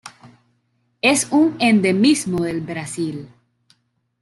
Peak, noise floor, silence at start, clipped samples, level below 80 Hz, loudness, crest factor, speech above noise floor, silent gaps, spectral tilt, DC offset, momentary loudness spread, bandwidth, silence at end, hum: -2 dBFS; -66 dBFS; 0.05 s; under 0.1%; -58 dBFS; -18 LUFS; 18 dB; 49 dB; none; -4 dB/octave; under 0.1%; 12 LU; 12.5 kHz; 0.95 s; none